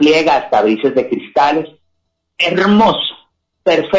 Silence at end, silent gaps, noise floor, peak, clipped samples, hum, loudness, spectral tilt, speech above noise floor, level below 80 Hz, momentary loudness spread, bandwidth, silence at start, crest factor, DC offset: 0 s; none; -68 dBFS; -2 dBFS; under 0.1%; none; -14 LUFS; -5.5 dB/octave; 56 dB; -52 dBFS; 10 LU; 7.6 kHz; 0 s; 12 dB; under 0.1%